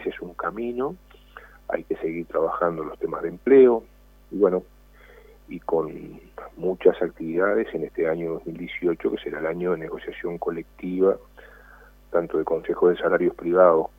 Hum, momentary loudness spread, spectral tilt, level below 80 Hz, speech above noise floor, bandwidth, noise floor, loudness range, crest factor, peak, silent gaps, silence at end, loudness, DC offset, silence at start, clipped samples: 50 Hz at -55 dBFS; 15 LU; -8.5 dB/octave; -52 dBFS; 27 dB; 3.8 kHz; -50 dBFS; 6 LU; 20 dB; -4 dBFS; none; 0.1 s; -24 LUFS; under 0.1%; 0 s; under 0.1%